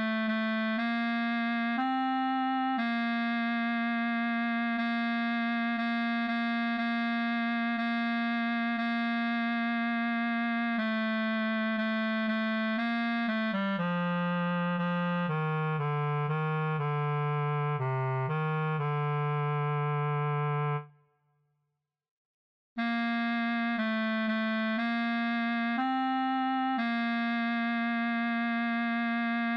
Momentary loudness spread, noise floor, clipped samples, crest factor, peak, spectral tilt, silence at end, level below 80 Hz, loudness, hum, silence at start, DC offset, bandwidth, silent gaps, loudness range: 1 LU; -83 dBFS; under 0.1%; 10 dB; -20 dBFS; -8.5 dB/octave; 0 s; -84 dBFS; -30 LUFS; none; 0 s; under 0.1%; 5.6 kHz; 22.11-22.76 s; 2 LU